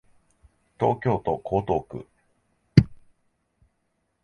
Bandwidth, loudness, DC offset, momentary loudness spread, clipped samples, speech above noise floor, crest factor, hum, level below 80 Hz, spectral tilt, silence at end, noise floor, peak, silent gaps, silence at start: 6.8 kHz; -24 LUFS; under 0.1%; 15 LU; under 0.1%; 49 dB; 26 dB; none; -46 dBFS; -9 dB/octave; 1.3 s; -74 dBFS; 0 dBFS; none; 0.8 s